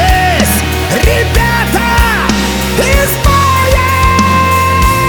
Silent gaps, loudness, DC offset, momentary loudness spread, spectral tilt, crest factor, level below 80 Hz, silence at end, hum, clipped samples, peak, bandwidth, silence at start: none; -9 LUFS; under 0.1%; 3 LU; -4.5 dB/octave; 10 dB; -16 dBFS; 0 s; none; under 0.1%; 0 dBFS; over 20 kHz; 0 s